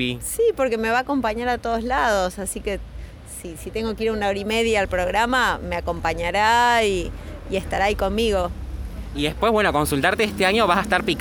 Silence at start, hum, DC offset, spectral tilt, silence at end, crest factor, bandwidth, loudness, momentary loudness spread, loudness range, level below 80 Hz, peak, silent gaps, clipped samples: 0 s; none; under 0.1%; -4 dB/octave; 0 s; 18 dB; over 20 kHz; -21 LUFS; 14 LU; 4 LU; -36 dBFS; -4 dBFS; none; under 0.1%